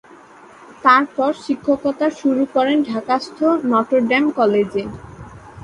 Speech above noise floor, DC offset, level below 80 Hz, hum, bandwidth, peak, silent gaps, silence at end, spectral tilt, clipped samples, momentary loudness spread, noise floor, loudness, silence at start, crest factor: 26 dB; under 0.1%; -52 dBFS; none; 11 kHz; 0 dBFS; none; 0.05 s; -6 dB/octave; under 0.1%; 10 LU; -43 dBFS; -17 LUFS; 0.7 s; 18 dB